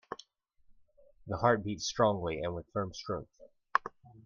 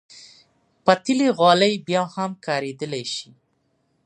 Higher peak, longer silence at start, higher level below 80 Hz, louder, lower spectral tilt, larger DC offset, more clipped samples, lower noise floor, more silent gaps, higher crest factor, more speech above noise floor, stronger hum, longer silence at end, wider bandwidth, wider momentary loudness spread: second, -8 dBFS vs 0 dBFS; about the same, 0.1 s vs 0.15 s; first, -60 dBFS vs -72 dBFS; second, -33 LUFS vs -21 LUFS; about the same, -5 dB/octave vs -4.5 dB/octave; neither; neither; about the same, -65 dBFS vs -68 dBFS; neither; first, 28 dB vs 22 dB; second, 33 dB vs 48 dB; neither; second, 0.05 s vs 0.8 s; second, 7.6 kHz vs 10.5 kHz; about the same, 13 LU vs 13 LU